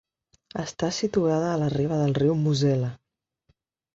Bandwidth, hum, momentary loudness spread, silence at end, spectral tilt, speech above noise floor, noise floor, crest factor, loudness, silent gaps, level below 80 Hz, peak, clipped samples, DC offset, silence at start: 7.8 kHz; none; 11 LU; 1 s; -6.5 dB/octave; 47 dB; -70 dBFS; 14 dB; -25 LUFS; none; -58 dBFS; -10 dBFS; under 0.1%; under 0.1%; 0.55 s